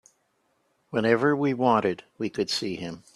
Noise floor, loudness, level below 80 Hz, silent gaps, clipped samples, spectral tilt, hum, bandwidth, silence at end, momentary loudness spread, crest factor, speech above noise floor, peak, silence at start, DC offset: -71 dBFS; -25 LUFS; -66 dBFS; none; under 0.1%; -5.5 dB/octave; none; 12.5 kHz; 0.15 s; 11 LU; 20 dB; 46 dB; -6 dBFS; 0.9 s; under 0.1%